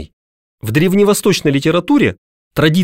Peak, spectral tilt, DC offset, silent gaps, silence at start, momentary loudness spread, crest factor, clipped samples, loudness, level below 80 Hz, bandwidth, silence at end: -2 dBFS; -5.5 dB/octave; under 0.1%; 0.13-0.58 s, 2.18-2.51 s; 0 s; 7 LU; 12 dB; under 0.1%; -14 LUFS; -44 dBFS; 16.5 kHz; 0 s